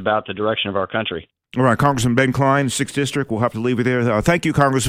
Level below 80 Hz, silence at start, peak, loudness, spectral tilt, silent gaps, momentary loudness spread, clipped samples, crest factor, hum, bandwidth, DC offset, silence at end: -44 dBFS; 0 s; -2 dBFS; -19 LUFS; -5.5 dB/octave; none; 6 LU; under 0.1%; 16 dB; none; 16 kHz; under 0.1%; 0 s